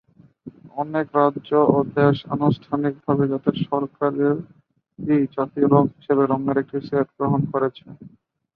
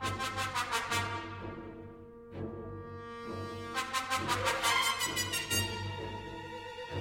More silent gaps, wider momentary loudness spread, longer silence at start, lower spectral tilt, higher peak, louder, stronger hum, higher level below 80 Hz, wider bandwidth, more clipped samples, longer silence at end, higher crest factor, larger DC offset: neither; second, 7 LU vs 16 LU; first, 0.45 s vs 0 s; first, -11 dB/octave vs -2.5 dB/octave; first, -2 dBFS vs -16 dBFS; first, -21 LUFS vs -34 LUFS; neither; about the same, -58 dBFS vs -58 dBFS; second, 5 kHz vs 16.5 kHz; neither; first, 0.45 s vs 0 s; about the same, 20 dB vs 20 dB; neither